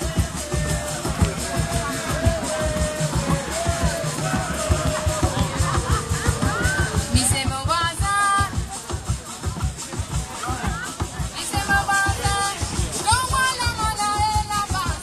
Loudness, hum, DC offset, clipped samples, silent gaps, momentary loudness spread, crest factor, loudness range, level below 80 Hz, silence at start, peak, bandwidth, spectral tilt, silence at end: -22 LUFS; none; under 0.1%; under 0.1%; none; 8 LU; 18 dB; 3 LU; -32 dBFS; 0 s; -4 dBFS; 15.5 kHz; -3.5 dB/octave; 0 s